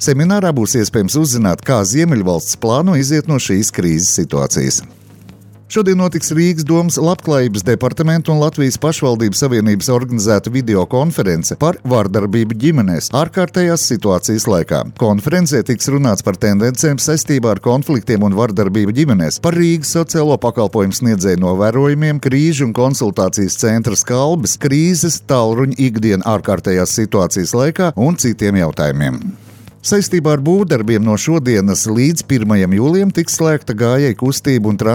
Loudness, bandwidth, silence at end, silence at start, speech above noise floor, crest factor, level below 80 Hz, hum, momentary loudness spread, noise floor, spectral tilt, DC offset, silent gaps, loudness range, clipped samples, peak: -14 LUFS; 18 kHz; 0 s; 0 s; 26 dB; 12 dB; -44 dBFS; none; 3 LU; -39 dBFS; -5.5 dB/octave; under 0.1%; none; 2 LU; under 0.1%; -2 dBFS